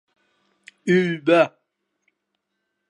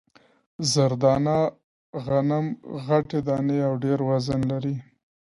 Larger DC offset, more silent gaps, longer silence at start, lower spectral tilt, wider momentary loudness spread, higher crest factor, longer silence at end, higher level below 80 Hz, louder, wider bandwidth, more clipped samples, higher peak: neither; second, none vs 1.64-1.93 s; first, 0.85 s vs 0.6 s; about the same, -6.5 dB/octave vs -6 dB/octave; second, 7 LU vs 10 LU; about the same, 22 dB vs 18 dB; first, 1.4 s vs 0.4 s; second, -72 dBFS vs -56 dBFS; first, -20 LUFS vs -24 LUFS; about the same, 10.5 kHz vs 11.5 kHz; neither; first, -2 dBFS vs -6 dBFS